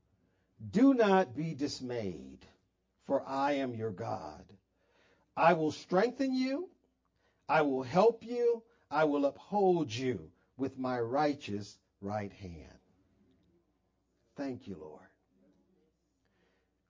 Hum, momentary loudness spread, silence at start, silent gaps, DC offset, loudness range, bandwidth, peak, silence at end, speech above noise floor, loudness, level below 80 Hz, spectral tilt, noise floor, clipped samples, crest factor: none; 20 LU; 0.6 s; none; under 0.1%; 17 LU; 7.6 kHz; -12 dBFS; 1.9 s; 45 dB; -32 LUFS; -68 dBFS; -6.5 dB/octave; -77 dBFS; under 0.1%; 22 dB